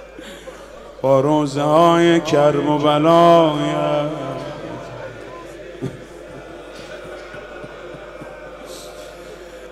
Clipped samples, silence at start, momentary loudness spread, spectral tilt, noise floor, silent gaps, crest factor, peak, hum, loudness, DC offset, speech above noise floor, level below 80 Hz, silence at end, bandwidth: under 0.1%; 0 s; 23 LU; -6 dB/octave; -37 dBFS; none; 18 dB; 0 dBFS; none; -15 LUFS; under 0.1%; 23 dB; -50 dBFS; 0 s; 13 kHz